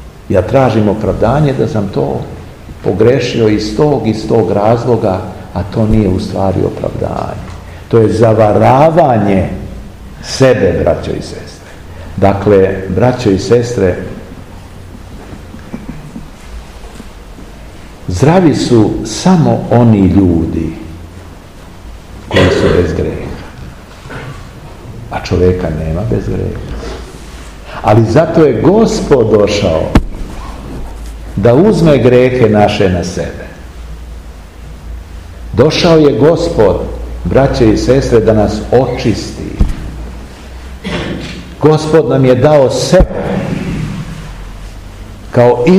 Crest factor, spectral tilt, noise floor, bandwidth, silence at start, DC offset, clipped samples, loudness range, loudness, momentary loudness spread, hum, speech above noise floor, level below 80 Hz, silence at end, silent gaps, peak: 12 dB; -7 dB/octave; -32 dBFS; 15 kHz; 0 s; 0.4%; 2%; 7 LU; -10 LUFS; 23 LU; none; 23 dB; -26 dBFS; 0 s; none; 0 dBFS